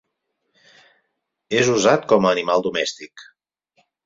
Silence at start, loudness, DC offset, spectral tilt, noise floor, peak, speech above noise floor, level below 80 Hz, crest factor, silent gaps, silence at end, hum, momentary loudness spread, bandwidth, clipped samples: 1.5 s; -18 LUFS; under 0.1%; -4 dB/octave; -75 dBFS; -2 dBFS; 57 dB; -62 dBFS; 20 dB; none; 0.85 s; none; 12 LU; 7.8 kHz; under 0.1%